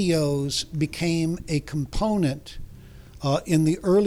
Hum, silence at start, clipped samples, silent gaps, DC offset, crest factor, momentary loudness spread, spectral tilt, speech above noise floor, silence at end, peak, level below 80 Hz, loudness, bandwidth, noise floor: none; 0 s; under 0.1%; none; under 0.1%; 16 dB; 9 LU; -6 dB/octave; 21 dB; 0 s; -8 dBFS; -40 dBFS; -25 LUFS; 15.5 kHz; -44 dBFS